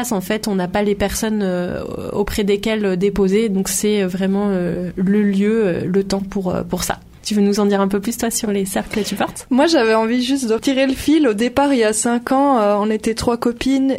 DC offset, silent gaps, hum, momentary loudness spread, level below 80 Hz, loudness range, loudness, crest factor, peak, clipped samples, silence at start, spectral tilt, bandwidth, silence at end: under 0.1%; none; none; 7 LU; -40 dBFS; 3 LU; -18 LUFS; 14 dB; -2 dBFS; under 0.1%; 0 s; -5 dB/octave; 16 kHz; 0 s